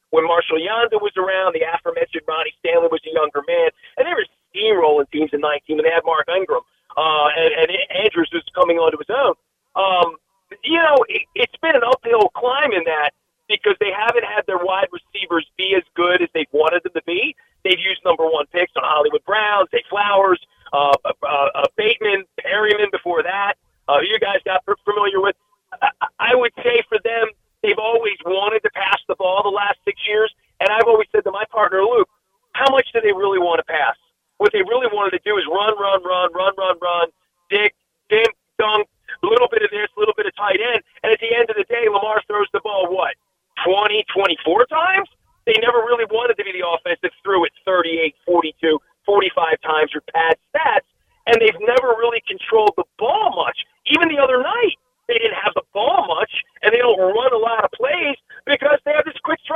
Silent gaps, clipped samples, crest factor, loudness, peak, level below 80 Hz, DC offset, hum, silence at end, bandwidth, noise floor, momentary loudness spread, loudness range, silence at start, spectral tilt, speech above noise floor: none; under 0.1%; 18 dB; -18 LUFS; 0 dBFS; -62 dBFS; under 0.1%; none; 0 s; 7.6 kHz; -59 dBFS; 6 LU; 2 LU; 0.1 s; -4.5 dB/octave; 41 dB